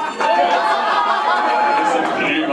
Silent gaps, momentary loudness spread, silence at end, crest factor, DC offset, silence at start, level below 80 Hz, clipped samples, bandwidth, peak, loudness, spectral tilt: none; 2 LU; 0 s; 12 dB; under 0.1%; 0 s; -66 dBFS; under 0.1%; 11.5 kHz; -4 dBFS; -16 LUFS; -3.5 dB/octave